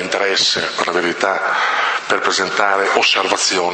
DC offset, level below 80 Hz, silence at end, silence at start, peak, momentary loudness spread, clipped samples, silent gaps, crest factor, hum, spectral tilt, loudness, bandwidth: under 0.1%; -62 dBFS; 0 s; 0 s; 0 dBFS; 4 LU; under 0.1%; none; 16 dB; none; -1 dB/octave; -15 LUFS; 8.8 kHz